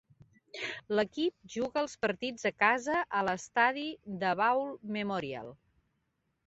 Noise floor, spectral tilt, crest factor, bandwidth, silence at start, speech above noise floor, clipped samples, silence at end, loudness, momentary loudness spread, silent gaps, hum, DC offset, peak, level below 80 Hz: -79 dBFS; -2.5 dB/octave; 22 dB; 8 kHz; 0.55 s; 48 dB; under 0.1%; 0.95 s; -32 LUFS; 11 LU; none; none; under 0.1%; -12 dBFS; -70 dBFS